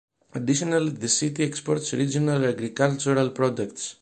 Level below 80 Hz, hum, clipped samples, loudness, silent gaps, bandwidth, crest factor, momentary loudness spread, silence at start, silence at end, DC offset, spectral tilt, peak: -62 dBFS; none; under 0.1%; -24 LUFS; none; 9.8 kHz; 18 dB; 6 LU; 0.35 s; 0.1 s; under 0.1%; -4.5 dB/octave; -6 dBFS